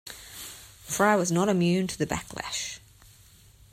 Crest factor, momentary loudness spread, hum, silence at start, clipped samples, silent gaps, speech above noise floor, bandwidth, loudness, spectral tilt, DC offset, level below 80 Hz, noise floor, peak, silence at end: 20 dB; 18 LU; none; 0.05 s; under 0.1%; none; 29 dB; 16 kHz; -26 LUFS; -4.5 dB/octave; under 0.1%; -56 dBFS; -55 dBFS; -8 dBFS; 0.95 s